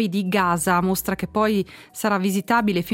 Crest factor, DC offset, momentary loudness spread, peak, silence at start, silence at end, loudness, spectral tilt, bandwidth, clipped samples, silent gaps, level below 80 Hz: 16 dB; under 0.1%; 5 LU; -4 dBFS; 0 s; 0 s; -21 LUFS; -5 dB/octave; 17 kHz; under 0.1%; none; -50 dBFS